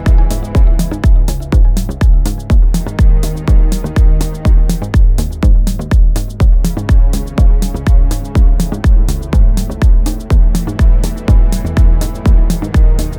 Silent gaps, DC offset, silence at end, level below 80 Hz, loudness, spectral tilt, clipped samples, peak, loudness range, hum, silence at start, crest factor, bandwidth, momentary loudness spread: none; under 0.1%; 0 s; -10 dBFS; -13 LUFS; -7 dB/octave; under 0.1%; 0 dBFS; 0 LU; none; 0 s; 8 dB; 14 kHz; 2 LU